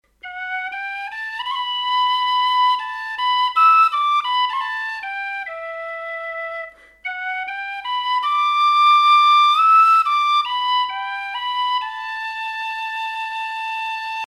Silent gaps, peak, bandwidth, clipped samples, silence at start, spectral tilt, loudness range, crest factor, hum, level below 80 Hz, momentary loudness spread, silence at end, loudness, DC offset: none; -4 dBFS; 12.5 kHz; under 0.1%; 0.25 s; 2.5 dB/octave; 10 LU; 14 dB; none; -64 dBFS; 15 LU; 0.1 s; -18 LUFS; under 0.1%